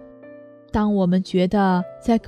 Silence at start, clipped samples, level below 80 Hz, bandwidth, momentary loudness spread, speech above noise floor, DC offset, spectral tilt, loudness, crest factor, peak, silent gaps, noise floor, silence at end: 0 s; under 0.1%; -44 dBFS; 9.8 kHz; 5 LU; 24 dB; under 0.1%; -8 dB/octave; -20 LUFS; 14 dB; -6 dBFS; none; -43 dBFS; 0 s